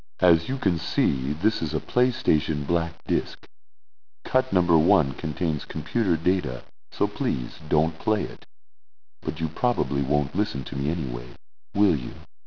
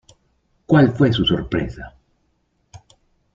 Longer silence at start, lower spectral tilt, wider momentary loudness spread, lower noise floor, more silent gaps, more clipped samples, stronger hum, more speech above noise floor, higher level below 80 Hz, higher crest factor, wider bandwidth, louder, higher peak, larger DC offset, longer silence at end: second, 0.2 s vs 0.7 s; about the same, -8.5 dB/octave vs -7.5 dB/octave; second, 12 LU vs 20 LU; first, under -90 dBFS vs -66 dBFS; neither; neither; neither; first, over 66 dB vs 49 dB; about the same, -44 dBFS vs -42 dBFS; about the same, 20 dB vs 20 dB; second, 5.4 kHz vs 7.6 kHz; second, -25 LUFS vs -18 LUFS; about the same, -4 dBFS vs -2 dBFS; first, 2% vs under 0.1%; second, 0.2 s vs 0.6 s